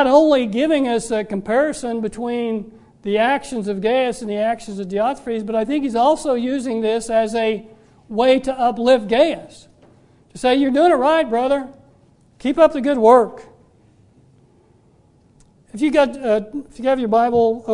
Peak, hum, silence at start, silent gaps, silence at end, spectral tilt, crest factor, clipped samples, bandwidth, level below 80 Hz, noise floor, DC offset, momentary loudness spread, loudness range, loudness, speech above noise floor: 0 dBFS; none; 0 s; none; 0 s; -5 dB/octave; 18 dB; under 0.1%; 11 kHz; -50 dBFS; -54 dBFS; under 0.1%; 10 LU; 4 LU; -18 LUFS; 37 dB